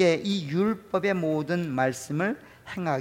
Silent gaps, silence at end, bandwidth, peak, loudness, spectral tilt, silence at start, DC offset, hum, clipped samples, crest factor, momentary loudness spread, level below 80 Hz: none; 0 s; 16.5 kHz; -10 dBFS; -27 LUFS; -6 dB/octave; 0 s; under 0.1%; none; under 0.1%; 18 dB; 6 LU; -64 dBFS